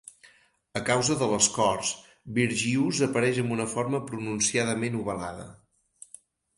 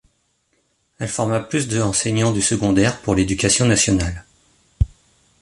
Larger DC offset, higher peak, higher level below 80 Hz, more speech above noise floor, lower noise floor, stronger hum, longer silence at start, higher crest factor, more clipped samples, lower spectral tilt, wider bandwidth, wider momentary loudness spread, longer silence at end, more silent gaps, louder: neither; second, -8 dBFS vs -4 dBFS; second, -60 dBFS vs -34 dBFS; second, 34 dB vs 48 dB; second, -60 dBFS vs -66 dBFS; neither; second, 0.25 s vs 1 s; about the same, 20 dB vs 18 dB; neither; about the same, -3.5 dB/octave vs -4 dB/octave; about the same, 11.5 kHz vs 11.5 kHz; first, 16 LU vs 10 LU; first, 1.05 s vs 0.55 s; neither; second, -26 LUFS vs -19 LUFS